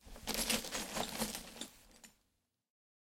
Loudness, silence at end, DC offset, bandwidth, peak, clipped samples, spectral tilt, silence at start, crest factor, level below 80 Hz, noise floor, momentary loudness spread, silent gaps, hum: -39 LUFS; 0.9 s; under 0.1%; 16.5 kHz; -18 dBFS; under 0.1%; -1.5 dB/octave; 0.05 s; 26 dB; -60 dBFS; -82 dBFS; 17 LU; none; none